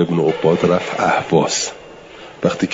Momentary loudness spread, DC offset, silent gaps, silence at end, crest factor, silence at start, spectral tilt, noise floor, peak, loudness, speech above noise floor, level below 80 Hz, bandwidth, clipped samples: 22 LU; under 0.1%; none; 0 s; 16 dB; 0 s; -4.5 dB/octave; -38 dBFS; -2 dBFS; -17 LUFS; 21 dB; -54 dBFS; 7.8 kHz; under 0.1%